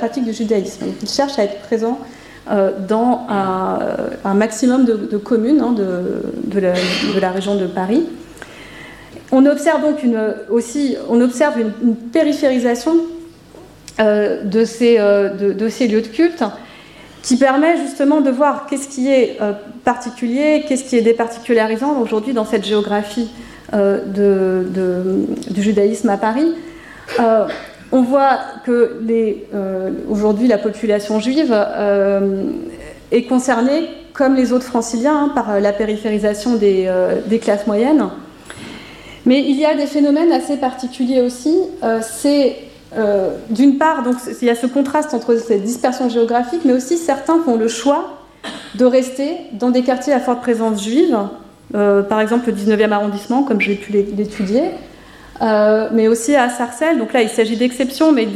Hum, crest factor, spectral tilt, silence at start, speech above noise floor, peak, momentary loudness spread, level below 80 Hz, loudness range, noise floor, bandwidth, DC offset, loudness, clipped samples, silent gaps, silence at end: none; 14 dB; -5.5 dB/octave; 0 s; 25 dB; -2 dBFS; 9 LU; -52 dBFS; 2 LU; -40 dBFS; 14 kHz; under 0.1%; -16 LUFS; under 0.1%; none; 0 s